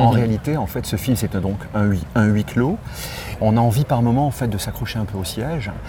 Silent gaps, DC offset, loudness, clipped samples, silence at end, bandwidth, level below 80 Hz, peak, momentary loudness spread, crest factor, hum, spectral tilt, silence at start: none; under 0.1%; -21 LUFS; under 0.1%; 0 s; over 20 kHz; -38 dBFS; -2 dBFS; 8 LU; 16 dB; none; -6.5 dB/octave; 0 s